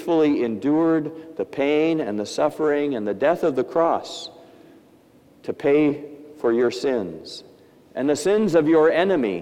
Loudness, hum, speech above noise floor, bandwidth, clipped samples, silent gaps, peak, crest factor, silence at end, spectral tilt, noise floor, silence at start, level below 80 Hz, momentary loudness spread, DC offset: -21 LUFS; none; 32 dB; 13 kHz; under 0.1%; none; -4 dBFS; 18 dB; 0 s; -6 dB/octave; -53 dBFS; 0 s; -64 dBFS; 16 LU; under 0.1%